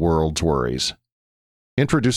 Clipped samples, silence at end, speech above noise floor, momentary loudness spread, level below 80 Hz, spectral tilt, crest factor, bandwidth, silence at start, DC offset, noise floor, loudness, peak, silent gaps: under 0.1%; 0 s; over 70 dB; 6 LU; -36 dBFS; -5 dB/octave; 16 dB; 14 kHz; 0 s; under 0.1%; under -90 dBFS; -22 LUFS; -6 dBFS; 1.12-1.77 s